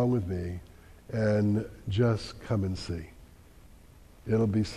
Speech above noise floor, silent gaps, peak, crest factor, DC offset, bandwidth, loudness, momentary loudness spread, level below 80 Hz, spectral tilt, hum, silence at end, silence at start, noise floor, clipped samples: 25 dB; none; -14 dBFS; 16 dB; under 0.1%; 12 kHz; -30 LUFS; 13 LU; -50 dBFS; -7.5 dB/octave; none; 0 s; 0 s; -53 dBFS; under 0.1%